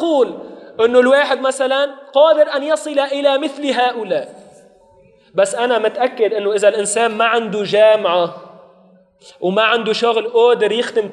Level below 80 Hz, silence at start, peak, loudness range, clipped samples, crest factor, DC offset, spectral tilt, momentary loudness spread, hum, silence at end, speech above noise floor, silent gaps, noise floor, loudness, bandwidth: -70 dBFS; 0 s; 0 dBFS; 4 LU; under 0.1%; 16 dB; under 0.1%; -3 dB/octave; 8 LU; none; 0 s; 35 dB; none; -50 dBFS; -15 LUFS; 12 kHz